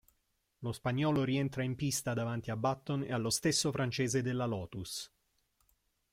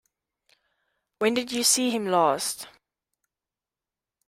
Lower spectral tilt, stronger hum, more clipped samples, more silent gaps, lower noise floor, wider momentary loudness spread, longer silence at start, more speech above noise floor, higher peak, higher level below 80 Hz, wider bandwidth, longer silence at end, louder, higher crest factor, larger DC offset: first, -4.5 dB/octave vs -2 dB/octave; neither; neither; neither; second, -79 dBFS vs under -90 dBFS; about the same, 10 LU vs 12 LU; second, 0.6 s vs 1.2 s; second, 45 dB vs over 66 dB; second, -18 dBFS vs -6 dBFS; first, -64 dBFS vs -72 dBFS; about the same, 16.5 kHz vs 16 kHz; second, 1.05 s vs 1.6 s; second, -34 LUFS vs -23 LUFS; second, 16 dB vs 22 dB; neither